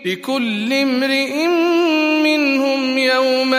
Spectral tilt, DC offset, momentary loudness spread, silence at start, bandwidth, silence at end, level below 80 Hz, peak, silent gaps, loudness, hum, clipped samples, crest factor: -3.5 dB/octave; under 0.1%; 4 LU; 0 s; 15.5 kHz; 0 s; -72 dBFS; -2 dBFS; none; -16 LUFS; none; under 0.1%; 14 dB